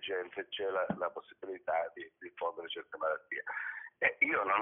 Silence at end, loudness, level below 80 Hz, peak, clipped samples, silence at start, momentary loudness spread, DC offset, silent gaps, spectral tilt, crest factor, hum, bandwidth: 0 s; -36 LUFS; -78 dBFS; -16 dBFS; under 0.1%; 0 s; 13 LU; under 0.1%; none; 2 dB/octave; 20 dB; none; 3.8 kHz